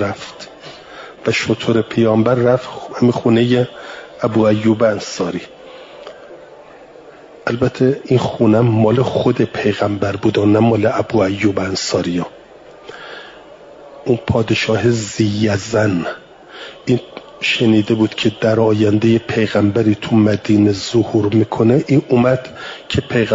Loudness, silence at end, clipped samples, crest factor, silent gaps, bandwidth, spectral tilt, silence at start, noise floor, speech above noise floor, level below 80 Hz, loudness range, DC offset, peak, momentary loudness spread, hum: -15 LUFS; 0 s; under 0.1%; 14 dB; none; 7.8 kHz; -6.5 dB/octave; 0 s; -40 dBFS; 25 dB; -50 dBFS; 6 LU; under 0.1%; -2 dBFS; 19 LU; none